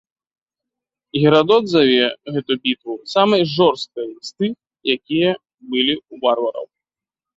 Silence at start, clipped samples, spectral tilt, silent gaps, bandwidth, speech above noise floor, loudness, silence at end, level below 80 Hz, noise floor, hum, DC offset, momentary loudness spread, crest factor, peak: 1.15 s; under 0.1%; -6 dB/octave; 5.54-5.58 s; 7.8 kHz; 72 dB; -18 LUFS; 0.7 s; -60 dBFS; -89 dBFS; none; under 0.1%; 13 LU; 18 dB; -2 dBFS